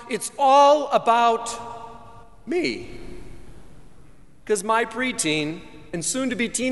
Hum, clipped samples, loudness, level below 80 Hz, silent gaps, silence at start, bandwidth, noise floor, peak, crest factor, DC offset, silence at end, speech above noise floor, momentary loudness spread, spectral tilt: none; under 0.1%; -21 LUFS; -52 dBFS; none; 0 s; 11.5 kHz; -51 dBFS; -6 dBFS; 18 dB; 0.5%; 0 s; 29 dB; 22 LU; -3 dB/octave